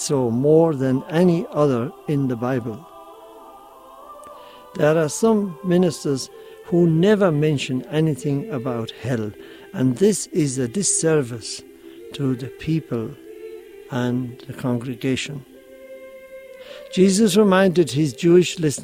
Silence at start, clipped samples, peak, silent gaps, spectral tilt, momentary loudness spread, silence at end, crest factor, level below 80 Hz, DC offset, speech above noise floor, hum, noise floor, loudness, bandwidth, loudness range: 0 s; under 0.1%; -4 dBFS; none; -5.5 dB/octave; 23 LU; 0 s; 18 dB; -58 dBFS; under 0.1%; 24 dB; none; -44 dBFS; -20 LUFS; 16 kHz; 8 LU